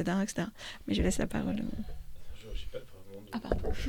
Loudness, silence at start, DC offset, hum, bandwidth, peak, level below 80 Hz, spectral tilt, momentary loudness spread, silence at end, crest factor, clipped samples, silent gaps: -35 LUFS; 0 s; under 0.1%; none; 19 kHz; -14 dBFS; -42 dBFS; -5.5 dB/octave; 20 LU; 0 s; 20 dB; under 0.1%; none